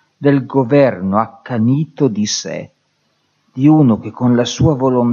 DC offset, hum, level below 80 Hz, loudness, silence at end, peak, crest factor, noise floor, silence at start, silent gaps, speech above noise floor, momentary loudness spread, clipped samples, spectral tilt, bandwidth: under 0.1%; none; -48 dBFS; -14 LUFS; 0 s; 0 dBFS; 14 dB; -63 dBFS; 0.2 s; none; 49 dB; 8 LU; under 0.1%; -6.5 dB/octave; 7.4 kHz